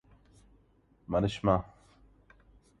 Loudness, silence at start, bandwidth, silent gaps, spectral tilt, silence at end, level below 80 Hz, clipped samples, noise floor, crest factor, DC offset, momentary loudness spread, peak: -30 LUFS; 1.1 s; 10.5 kHz; none; -7.5 dB/octave; 1.15 s; -52 dBFS; under 0.1%; -66 dBFS; 24 dB; under 0.1%; 24 LU; -12 dBFS